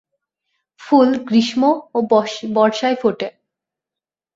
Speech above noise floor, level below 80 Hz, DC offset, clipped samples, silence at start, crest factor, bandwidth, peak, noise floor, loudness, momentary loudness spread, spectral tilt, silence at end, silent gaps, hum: 72 dB; -64 dBFS; under 0.1%; under 0.1%; 0.8 s; 18 dB; 7.8 kHz; -2 dBFS; -88 dBFS; -17 LUFS; 7 LU; -5.5 dB/octave; 1.05 s; none; none